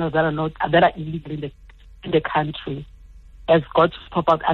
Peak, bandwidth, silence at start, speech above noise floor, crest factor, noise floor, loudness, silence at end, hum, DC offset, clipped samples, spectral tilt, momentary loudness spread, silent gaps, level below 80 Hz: -4 dBFS; 6 kHz; 0 s; 23 dB; 18 dB; -44 dBFS; -21 LUFS; 0 s; none; under 0.1%; under 0.1%; -8.5 dB/octave; 16 LU; none; -44 dBFS